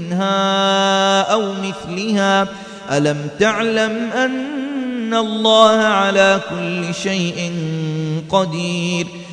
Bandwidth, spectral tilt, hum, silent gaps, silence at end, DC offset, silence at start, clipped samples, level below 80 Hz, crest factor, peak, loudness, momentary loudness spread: 10.5 kHz; -4.5 dB/octave; none; none; 0 s; under 0.1%; 0 s; under 0.1%; -56 dBFS; 16 dB; 0 dBFS; -17 LUFS; 10 LU